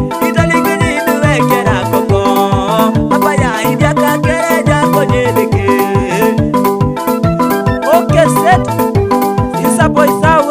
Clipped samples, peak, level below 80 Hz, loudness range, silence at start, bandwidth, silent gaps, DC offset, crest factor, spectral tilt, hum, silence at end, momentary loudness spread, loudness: 0.3%; 0 dBFS; -30 dBFS; 1 LU; 0 s; 16.5 kHz; none; 0.1%; 10 dB; -6 dB/octave; none; 0 s; 3 LU; -11 LUFS